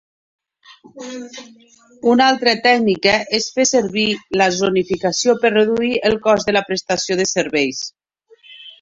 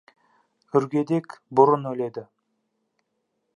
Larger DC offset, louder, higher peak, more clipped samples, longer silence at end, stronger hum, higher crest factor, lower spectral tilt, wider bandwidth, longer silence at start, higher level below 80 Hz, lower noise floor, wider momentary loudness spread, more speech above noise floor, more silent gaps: neither; first, -16 LUFS vs -23 LUFS; first, 0 dBFS vs -4 dBFS; neither; second, 0.1 s vs 1.3 s; neither; second, 16 dB vs 22 dB; second, -3 dB/octave vs -9 dB/octave; second, 7.8 kHz vs 10 kHz; first, 0.95 s vs 0.75 s; first, -54 dBFS vs -74 dBFS; second, -52 dBFS vs -76 dBFS; first, 17 LU vs 12 LU; second, 35 dB vs 54 dB; neither